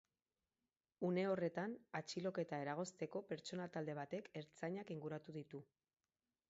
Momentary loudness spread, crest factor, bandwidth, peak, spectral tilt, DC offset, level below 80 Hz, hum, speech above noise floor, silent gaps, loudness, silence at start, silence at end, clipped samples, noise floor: 10 LU; 18 dB; 7.6 kHz; -30 dBFS; -5.5 dB/octave; under 0.1%; -88 dBFS; none; over 44 dB; none; -46 LUFS; 1 s; 0.85 s; under 0.1%; under -90 dBFS